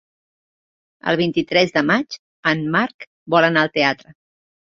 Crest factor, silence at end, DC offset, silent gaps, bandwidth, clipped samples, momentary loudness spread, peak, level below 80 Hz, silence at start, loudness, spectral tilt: 18 dB; 0.75 s; under 0.1%; 2.19-2.43 s, 2.94-2.99 s, 3.07-3.26 s; 7.4 kHz; under 0.1%; 11 LU; -2 dBFS; -60 dBFS; 1.05 s; -18 LUFS; -5.5 dB/octave